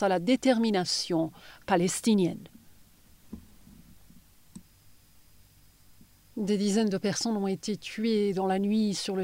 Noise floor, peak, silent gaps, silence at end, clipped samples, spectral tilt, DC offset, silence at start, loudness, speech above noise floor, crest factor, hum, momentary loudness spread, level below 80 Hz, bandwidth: -59 dBFS; -12 dBFS; none; 0 s; under 0.1%; -5 dB/octave; under 0.1%; 0 s; -28 LUFS; 32 dB; 18 dB; none; 19 LU; -64 dBFS; 16 kHz